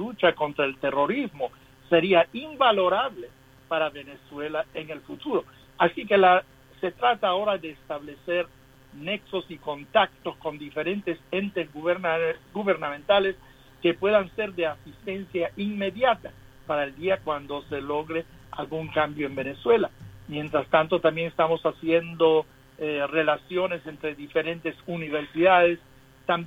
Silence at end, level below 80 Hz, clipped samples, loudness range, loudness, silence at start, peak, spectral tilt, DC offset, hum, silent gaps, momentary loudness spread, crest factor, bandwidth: 0 s; -58 dBFS; under 0.1%; 5 LU; -26 LUFS; 0 s; -6 dBFS; -6.5 dB/octave; under 0.1%; none; none; 14 LU; 20 dB; 15.5 kHz